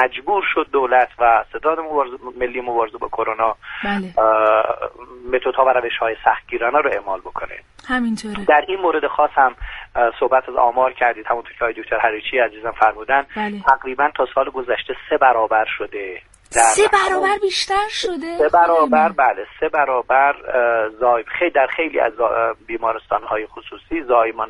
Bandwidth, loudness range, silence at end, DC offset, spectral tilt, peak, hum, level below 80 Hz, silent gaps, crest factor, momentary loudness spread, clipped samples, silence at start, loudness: 11.5 kHz; 3 LU; 0 s; under 0.1%; -3 dB/octave; 0 dBFS; none; -46 dBFS; none; 18 dB; 10 LU; under 0.1%; 0 s; -18 LUFS